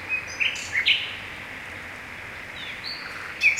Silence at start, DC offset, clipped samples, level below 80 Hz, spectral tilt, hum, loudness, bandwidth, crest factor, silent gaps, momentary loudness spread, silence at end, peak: 0 s; under 0.1%; under 0.1%; -58 dBFS; -0.5 dB/octave; none; -27 LUFS; 16 kHz; 22 dB; none; 15 LU; 0 s; -6 dBFS